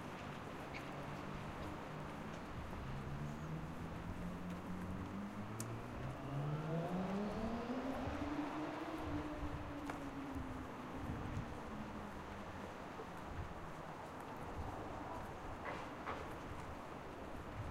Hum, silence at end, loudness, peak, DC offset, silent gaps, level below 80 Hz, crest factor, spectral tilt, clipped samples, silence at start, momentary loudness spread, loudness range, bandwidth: none; 0 s; -47 LUFS; -24 dBFS; under 0.1%; none; -56 dBFS; 22 dB; -6.5 dB/octave; under 0.1%; 0 s; 7 LU; 6 LU; 16 kHz